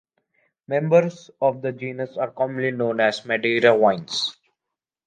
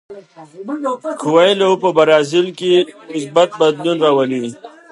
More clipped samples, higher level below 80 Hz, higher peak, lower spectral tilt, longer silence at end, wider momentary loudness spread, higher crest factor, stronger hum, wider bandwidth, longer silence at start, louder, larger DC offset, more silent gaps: neither; second, -72 dBFS vs -66 dBFS; about the same, -2 dBFS vs 0 dBFS; about the same, -5 dB/octave vs -5 dB/octave; first, 0.75 s vs 0.25 s; about the same, 12 LU vs 11 LU; about the same, 20 dB vs 16 dB; neither; second, 9.4 kHz vs 11.5 kHz; first, 0.7 s vs 0.1 s; second, -22 LUFS vs -15 LUFS; neither; neither